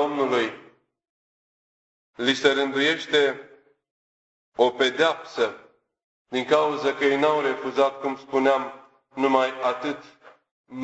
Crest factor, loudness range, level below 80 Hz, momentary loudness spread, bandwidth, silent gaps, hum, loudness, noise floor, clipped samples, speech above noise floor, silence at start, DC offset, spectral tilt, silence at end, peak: 20 dB; 2 LU; -70 dBFS; 10 LU; 8.2 kHz; 1.09-2.13 s, 3.91-4.52 s, 6.04-6.25 s, 10.51-10.64 s; none; -23 LUFS; under -90 dBFS; under 0.1%; over 67 dB; 0 s; under 0.1%; -3.5 dB/octave; 0 s; -6 dBFS